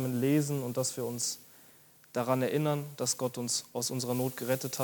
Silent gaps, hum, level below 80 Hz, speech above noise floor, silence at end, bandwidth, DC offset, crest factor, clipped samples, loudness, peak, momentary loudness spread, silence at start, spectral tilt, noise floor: none; none; -78 dBFS; 27 dB; 0 s; 19 kHz; under 0.1%; 18 dB; under 0.1%; -32 LUFS; -14 dBFS; 6 LU; 0 s; -4.5 dB/octave; -59 dBFS